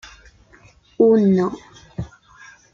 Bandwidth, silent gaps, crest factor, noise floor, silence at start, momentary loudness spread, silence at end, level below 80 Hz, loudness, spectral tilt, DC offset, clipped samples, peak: 7.4 kHz; none; 18 dB; -51 dBFS; 1 s; 22 LU; 0.65 s; -50 dBFS; -17 LUFS; -8.5 dB/octave; under 0.1%; under 0.1%; -4 dBFS